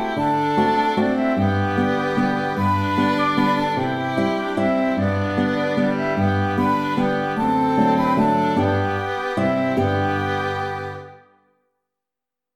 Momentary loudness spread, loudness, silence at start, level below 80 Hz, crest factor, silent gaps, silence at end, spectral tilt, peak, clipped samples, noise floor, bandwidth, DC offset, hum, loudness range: 4 LU; -20 LUFS; 0 s; -52 dBFS; 14 dB; none; 1.4 s; -7 dB/octave; -6 dBFS; under 0.1%; -87 dBFS; 14 kHz; under 0.1%; 50 Hz at -45 dBFS; 3 LU